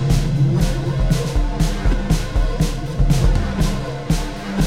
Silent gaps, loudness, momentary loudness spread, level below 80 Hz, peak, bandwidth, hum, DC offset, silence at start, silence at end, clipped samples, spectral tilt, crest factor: none; -20 LUFS; 5 LU; -20 dBFS; -4 dBFS; 15.5 kHz; none; 1%; 0 s; 0 s; under 0.1%; -6 dB/octave; 14 dB